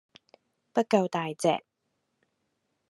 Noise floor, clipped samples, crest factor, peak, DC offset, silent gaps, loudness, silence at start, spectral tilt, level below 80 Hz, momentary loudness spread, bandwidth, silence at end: -79 dBFS; under 0.1%; 24 dB; -8 dBFS; under 0.1%; none; -28 LUFS; 0.75 s; -5.5 dB/octave; -84 dBFS; 6 LU; 13 kHz; 1.3 s